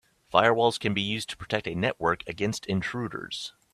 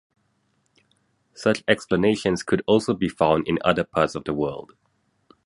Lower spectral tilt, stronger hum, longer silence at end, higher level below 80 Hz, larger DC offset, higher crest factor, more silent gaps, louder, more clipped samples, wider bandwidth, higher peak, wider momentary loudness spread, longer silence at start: about the same, -4.5 dB/octave vs -5.5 dB/octave; neither; second, 0.25 s vs 0.85 s; second, -58 dBFS vs -52 dBFS; neither; about the same, 24 dB vs 22 dB; neither; second, -27 LUFS vs -22 LUFS; neither; first, 14 kHz vs 11.5 kHz; about the same, -4 dBFS vs -2 dBFS; first, 11 LU vs 6 LU; second, 0.3 s vs 1.4 s